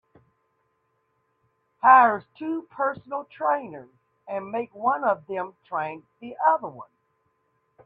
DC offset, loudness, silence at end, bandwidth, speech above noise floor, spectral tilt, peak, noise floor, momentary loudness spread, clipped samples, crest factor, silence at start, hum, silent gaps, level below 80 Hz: under 0.1%; -24 LUFS; 1 s; 4.7 kHz; 48 dB; -8 dB/octave; -4 dBFS; -72 dBFS; 19 LU; under 0.1%; 22 dB; 1.85 s; none; none; -74 dBFS